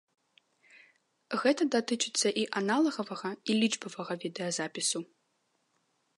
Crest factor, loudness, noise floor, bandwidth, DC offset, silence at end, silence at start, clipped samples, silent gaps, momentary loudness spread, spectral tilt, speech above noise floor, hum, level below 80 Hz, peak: 20 dB; -31 LUFS; -76 dBFS; 11.5 kHz; under 0.1%; 1.15 s; 1.3 s; under 0.1%; none; 9 LU; -3 dB/octave; 45 dB; none; -86 dBFS; -14 dBFS